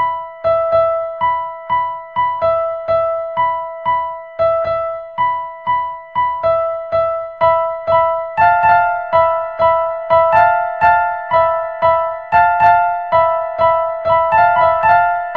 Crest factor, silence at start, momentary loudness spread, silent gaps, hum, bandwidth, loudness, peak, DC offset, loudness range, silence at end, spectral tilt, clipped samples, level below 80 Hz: 14 dB; 0 s; 8 LU; none; none; 5 kHz; -15 LUFS; 0 dBFS; 0.2%; 5 LU; 0 s; -6.5 dB/octave; under 0.1%; -46 dBFS